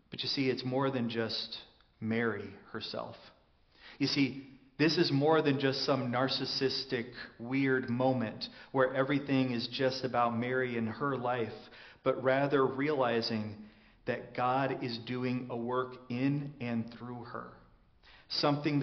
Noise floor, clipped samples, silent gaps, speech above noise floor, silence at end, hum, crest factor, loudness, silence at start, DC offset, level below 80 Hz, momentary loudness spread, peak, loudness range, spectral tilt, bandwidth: -62 dBFS; under 0.1%; none; 30 dB; 0 s; none; 20 dB; -33 LUFS; 0.1 s; under 0.1%; -70 dBFS; 14 LU; -14 dBFS; 6 LU; -4 dB/octave; 6.4 kHz